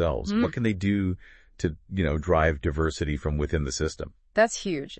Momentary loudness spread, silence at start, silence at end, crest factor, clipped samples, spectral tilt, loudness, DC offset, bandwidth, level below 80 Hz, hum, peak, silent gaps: 8 LU; 0 s; 0.05 s; 18 dB; under 0.1%; -6 dB/octave; -27 LUFS; under 0.1%; 8.8 kHz; -38 dBFS; none; -8 dBFS; none